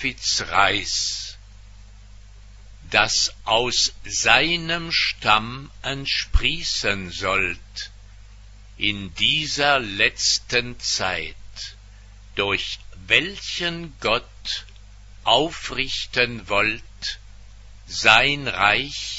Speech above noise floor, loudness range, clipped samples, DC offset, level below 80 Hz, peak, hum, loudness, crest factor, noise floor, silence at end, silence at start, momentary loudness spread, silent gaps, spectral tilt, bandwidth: 22 dB; 4 LU; under 0.1%; under 0.1%; -36 dBFS; 0 dBFS; none; -21 LUFS; 24 dB; -44 dBFS; 0 s; 0 s; 13 LU; none; -2 dB/octave; 8 kHz